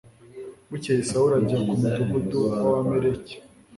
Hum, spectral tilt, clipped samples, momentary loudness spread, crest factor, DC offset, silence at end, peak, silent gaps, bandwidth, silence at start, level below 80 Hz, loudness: none; -7 dB/octave; under 0.1%; 20 LU; 14 dB; under 0.1%; 0.35 s; -10 dBFS; none; 11.5 kHz; 0.35 s; -52 dBFS; -23 LUFS